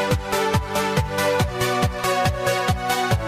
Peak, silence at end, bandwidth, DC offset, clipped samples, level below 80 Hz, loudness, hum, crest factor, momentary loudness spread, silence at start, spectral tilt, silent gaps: -8 dBFS; 0 s; 15.5 kHz; under 0.1%; under 0.1%; -34 dBFS; -21 LUFS; none; 14 dB; 1 LU; 0 s; -4.5 dB/octave; none